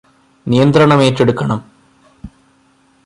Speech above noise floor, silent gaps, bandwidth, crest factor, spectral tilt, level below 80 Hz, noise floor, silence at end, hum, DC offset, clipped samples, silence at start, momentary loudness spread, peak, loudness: 42 dB; none; 11.5 kHz; 14 dB; -7 dB/octave; -46 dBFS; -53 dBFS; 0.8 s; none; under 0.1%; under 0.1%; 0.45 s; 13 LU; 0 dBFS; -12 LUFS